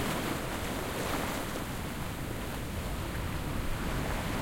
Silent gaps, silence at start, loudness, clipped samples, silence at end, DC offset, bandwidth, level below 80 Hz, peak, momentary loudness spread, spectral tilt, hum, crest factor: none; 0 s; -35 LUFS; under 0.1%; 0 s; under 0.1%; 16.5 kHz; -40 dBFS; -20 dBFS; 4 LU; -4.5 dB/octave; none; 14 dB